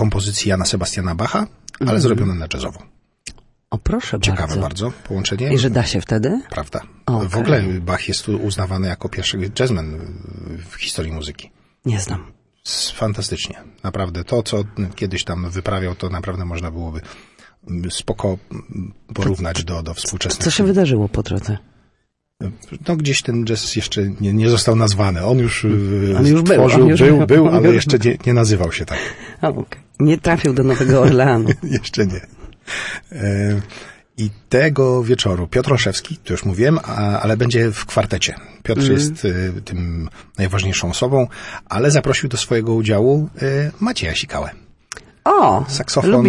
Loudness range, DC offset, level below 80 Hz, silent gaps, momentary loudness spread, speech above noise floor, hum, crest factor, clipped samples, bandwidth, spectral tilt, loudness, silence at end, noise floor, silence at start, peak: 11 LU; under 0.1%; -38 dBFS; none; 16 LU; 50 dB; none; 16 dB; under 0.1%; 11.5 kHz; -5.5 dB/octave; -17 LUFS; 0 s; -67 dBFS; 0 s; -2 dBFS